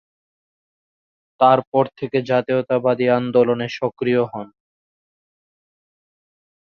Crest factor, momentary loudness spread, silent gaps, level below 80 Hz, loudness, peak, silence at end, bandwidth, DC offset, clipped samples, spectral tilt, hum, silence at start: 20 dB; 8 LU; 1.67-1.72 s; -64 dBFS; -19 LUFS; -2 dBFS; 2.2 s; 6.8 kHz; under 0.1%; under 0.1%; -7.5 dB/octave; none; 1.4 s